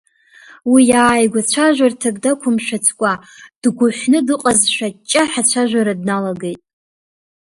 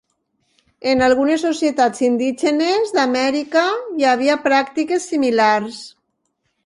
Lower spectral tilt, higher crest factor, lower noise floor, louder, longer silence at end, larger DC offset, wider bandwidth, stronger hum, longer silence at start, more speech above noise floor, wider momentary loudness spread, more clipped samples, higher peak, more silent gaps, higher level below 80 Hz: about the same, -3 dB/octave vs -3.5 dB/octave; about the same, 16 dB vs 16 dB; second, -45 dBFS vs -70 dBFS; about the same, -15 LUFS vs -17 LUFS; first, 1 s vs 0.75 s; neither; about the same, 11.5 kHz vs 11.5 kHz; neither; second, 0.65 s vs 0.85 s; second, 30 dB vs 53 dB; first, 9 LU vs 6 LU; neither; about the same, 0 dBFS vs -2 dBFS; first, 3.56-3.62 s vs none; about the same, -54 dBFS vs -56 dBFS